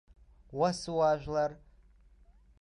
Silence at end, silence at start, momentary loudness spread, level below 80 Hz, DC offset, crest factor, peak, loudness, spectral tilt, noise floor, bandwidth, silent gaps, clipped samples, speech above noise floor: 1.05 s; 0.5 s; 7 LU; -58 dBFS; under 0.1%; 18 dB; -16 dBFS; -31 LUFS; -5.5 dB/octave; -61 dBFS; 11 kHz; none; under 0.1%; 31 dB